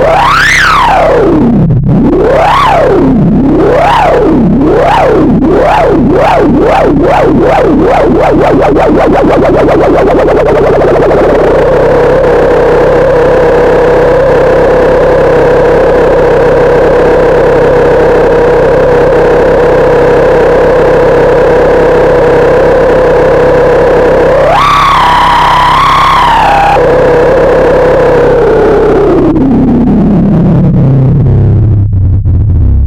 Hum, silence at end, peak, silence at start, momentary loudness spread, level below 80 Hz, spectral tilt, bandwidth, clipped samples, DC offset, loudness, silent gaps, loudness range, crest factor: none; 0 s; 0 dBFS; 0 s; 2 LU; -18 dBFS; -7 dB/octave; 13.5 kHz; under 0.1%; under 0.1%; -5 LUFS; none; 1 LU; 4 dB